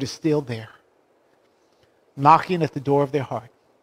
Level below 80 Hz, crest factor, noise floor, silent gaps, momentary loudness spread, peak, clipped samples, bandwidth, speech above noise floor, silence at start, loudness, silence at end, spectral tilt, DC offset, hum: -64 dBFS; 22 dB; -62 dBFS; none; 17 LU; -2 dBFS; under 0.1%; 15 kHz; 41 dB; 0 s; -21 LUFS; 0.35 s; -6.5 dB/octave; under 0.1%; none